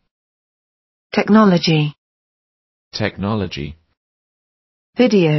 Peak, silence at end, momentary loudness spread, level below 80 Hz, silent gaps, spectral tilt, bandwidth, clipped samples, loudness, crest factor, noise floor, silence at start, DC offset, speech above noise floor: -2 dBFS; 0 s; 18 LU; -48 dBFS; 1.98-2.91 s, 3.97-4.93 s; -7 dB/octave; 6.2 kHz; under 0.1%; -16 LUFS; 18 dB; under -90 dBFS; 1.15 s; under 0.1%; over 75 dB